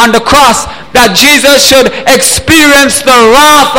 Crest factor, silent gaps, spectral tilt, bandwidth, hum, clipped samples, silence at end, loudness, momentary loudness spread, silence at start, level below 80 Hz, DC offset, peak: 4 dB; none; -2 dB/octave; over 20 kHz; none; 6%; 0 s; -3 LUFS; 5 LU; 0 s; -28 dBFS; 3%; 0 dBFS